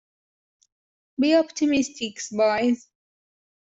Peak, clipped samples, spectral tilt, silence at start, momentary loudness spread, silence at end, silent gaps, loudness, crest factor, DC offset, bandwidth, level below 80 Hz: -8 dBFS; under 0.1%; -3.5 dB/octave; 1.2 s; 10 LU; 0.85 s; none; -23 LUFS; 16 dB; under 0.1%; 8 kHz; -66 dBFS